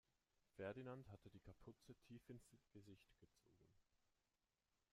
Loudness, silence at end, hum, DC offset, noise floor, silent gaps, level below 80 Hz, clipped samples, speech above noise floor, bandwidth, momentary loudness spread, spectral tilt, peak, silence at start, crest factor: -61 LUFS; 1.1 s; none; under 0.1%; under -90 dBFS; none; -82 dBFS; under 0.1%; over 29 dB; 15 kHz; 13 LU; -7 dB/octave; -40 dBFS; 0.55 s; 24 dB